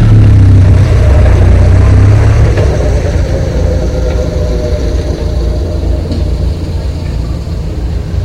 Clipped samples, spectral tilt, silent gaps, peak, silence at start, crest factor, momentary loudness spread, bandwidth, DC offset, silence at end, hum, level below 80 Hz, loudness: 0.9%; -8 dB/octave; none; 0 dBFS; 0 s; 8 dB; 11 LU; 9 kHz; under 0.1%; 0 s; none; -12 dBFS; -10 LUFS